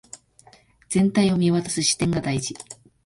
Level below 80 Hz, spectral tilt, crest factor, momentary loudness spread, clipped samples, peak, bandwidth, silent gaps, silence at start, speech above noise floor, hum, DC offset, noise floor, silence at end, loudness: -52 dBFS; -4.5 dB/octave; 16 dB; 13 LU; under 0.1%; -8 dBFS; 11.5 kHz; none; 0.15 s; 33 dB; none; under 0.1%; -54 dBFS; 0.3 s; -22 LUFS